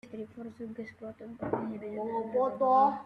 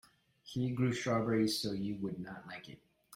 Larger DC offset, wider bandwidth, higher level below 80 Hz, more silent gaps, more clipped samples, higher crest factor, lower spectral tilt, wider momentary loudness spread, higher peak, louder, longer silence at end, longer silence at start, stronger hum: neither; second, 6.2 kHz vs 16 kHz; about the same, -70 dBFS vs -68 dBFS; neither; neither; about the same, 16 dB vs 16 dB; first, -8.5 dB/octave vs -5.5 dB/octave; first, 19 LU vs 16 LU; first, -16 dBFS vs -20 dBFS; first, -31 LUFS vs -36 LUFS; about the same, 0 s vs 0 s; second, 0.05 s vs 0.45 s; neither